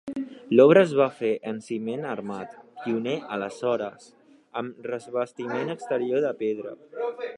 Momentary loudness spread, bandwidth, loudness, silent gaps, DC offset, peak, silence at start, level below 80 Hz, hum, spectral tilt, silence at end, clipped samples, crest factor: 17 LU; 11 kHz; -25 LUFS; none; under 0.1%; -4 dBFS; 0.05 s; -76 dBFS; none; -6.5 dB/octave; 0 s; under 0.1%; 22 dB